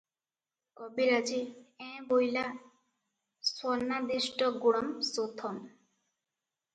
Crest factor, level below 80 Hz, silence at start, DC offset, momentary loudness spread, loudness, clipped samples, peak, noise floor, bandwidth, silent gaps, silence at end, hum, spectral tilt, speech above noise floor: 20 dB; -78 dBFS; 0.8 s; under 0.1%; 17 LU; -32 LUFS; under 0.1%; -14 dBFS; under -90 dBFS; 9.2 kHz; none; 1.05 s; none; -3 dB/octave; over 58 dB